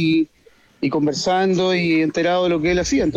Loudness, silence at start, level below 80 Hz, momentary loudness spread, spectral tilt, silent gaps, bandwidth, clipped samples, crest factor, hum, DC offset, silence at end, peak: -19 LUFS; 0 s; -44 dBFS; 5 LU; -5 dB/octave; none; 8.4 kHz; under 0.1%; 10 dB; none; under 0.1%; 0 s; -10 dBFS